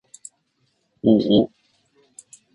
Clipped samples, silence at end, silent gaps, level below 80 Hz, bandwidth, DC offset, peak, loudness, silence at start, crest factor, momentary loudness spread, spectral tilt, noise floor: under 0.1%; 1.1 s; none; -58 dBFS; 11 kHz; under 0.1%; -2 dBFS; -19 LUFS; 1.05 s; 20 dB; 26 LU; -7 dB/octave; -69 dBFS